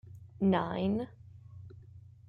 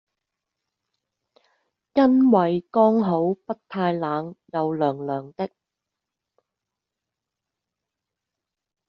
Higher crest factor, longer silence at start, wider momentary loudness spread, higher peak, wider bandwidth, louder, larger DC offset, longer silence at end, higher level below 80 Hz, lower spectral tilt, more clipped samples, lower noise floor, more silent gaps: about the same, 18 dB vs 20 dB; second, 0.05 s vs 1.95 s; first, 24 LU vs 14 LU; second, -16 dBFS vs -6 dBFS; second, 4.7 kHz vs 5.8 kHz; second, -32 LUFS vs -22 LUFS; neither; second, 0.3 s vs 3.4 s; about the same, -64 dBFS vs -68 dBFS; first, -9.5 dB/octave vs -7 dB/octave; neither; second, -53 dBFS vs -86 dBFS; neither